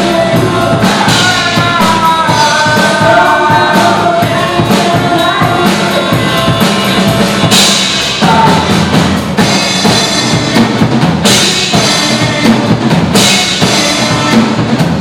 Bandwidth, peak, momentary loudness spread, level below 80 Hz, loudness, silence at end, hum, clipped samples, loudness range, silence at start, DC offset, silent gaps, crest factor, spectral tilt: 19.5 kHz; 0 dBFS; 3 LU; -34 dBFS; -8 LUFS; 0 s; none; 0.6%; 1 LU; 0 s; under 0.1%; none; 8 dB; -4 dB/octave